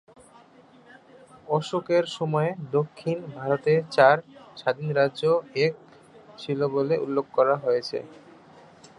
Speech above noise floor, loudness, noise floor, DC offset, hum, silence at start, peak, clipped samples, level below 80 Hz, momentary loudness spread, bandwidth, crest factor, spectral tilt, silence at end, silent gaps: 29 dB; -25 LUFS; -53 dBFS; under 0.1%; none; 1.5 s; -4 dBFS; under 0.1%; -72 dBFS; 12 LU; 11 kHz; 22 dB; -6.5 dB/octave; 0.85 s; none